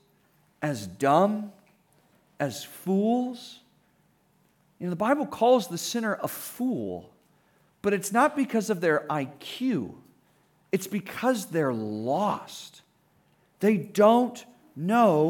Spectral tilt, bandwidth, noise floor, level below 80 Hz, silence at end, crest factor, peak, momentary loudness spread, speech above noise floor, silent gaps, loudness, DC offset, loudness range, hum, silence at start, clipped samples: -5.5 dB/octave; 19 kHz; -66 dBFS; -74 dBFS; 0 s; 20 dB; -8 dBFS; 14 LU; 40 dB; none; -27 LUFS; under 0.1%; 4 LU; none; 0.6 s; under 0.1%